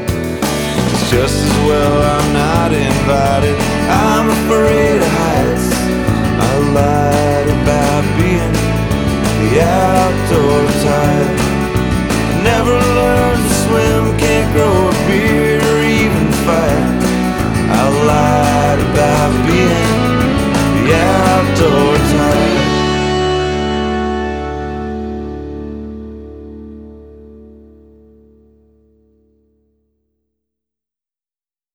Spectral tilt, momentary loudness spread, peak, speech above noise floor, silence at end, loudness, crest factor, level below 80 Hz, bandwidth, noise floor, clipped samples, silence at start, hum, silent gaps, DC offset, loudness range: -5.5 dB/octave; 7 LU; -2 dBFS; over 78 dB; 4.3 s; -13 LUFS; 12 dB; -26 dBFS; over 20 kHz; under -90 dBFS; under 0.1%; 0 s; none; none; under 0.1%; 7 LU